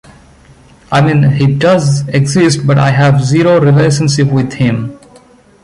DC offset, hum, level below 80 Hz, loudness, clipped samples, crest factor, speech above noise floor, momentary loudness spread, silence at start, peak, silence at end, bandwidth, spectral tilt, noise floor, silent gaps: under 0.1%; none; -42 dBFS; -10 LUFS; under 0.1%; 10 dB; 33 dB; 6 LU; 0.9 s; 0 dBFS; 0.7 s; 11.5 kHz; -6.5 dB/octave; -42 dBFS; none